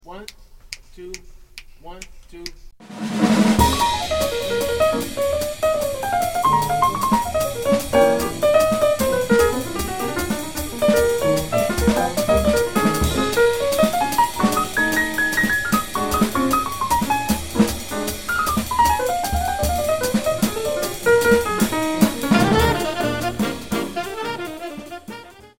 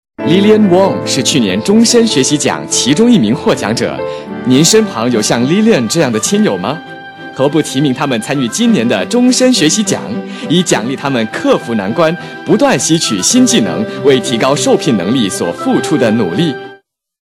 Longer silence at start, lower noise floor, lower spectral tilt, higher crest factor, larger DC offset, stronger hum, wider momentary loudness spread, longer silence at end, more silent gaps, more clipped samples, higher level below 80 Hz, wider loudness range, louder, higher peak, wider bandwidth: second, 0 s vs 0.2 s; about the same, -41 dBFS vs -41 dBFS; about the same, -4.5 dB/octave vs -4 dB/octave; first, 18 dB vs 12 dB; first, 1% vs under 0.1%; neither; first, 17 LU vs 8 LU; second, 0 s vs 0.5 s; neither; neither; first, -36 dBFS vs -50 dBFS; about the same, 3 LU vs 3 LU; second, -19 LUFS vs -11 LUFS; about the same, -2 dBFS vs 0 dBFS; first, 17 kHz vs 13.5 kHz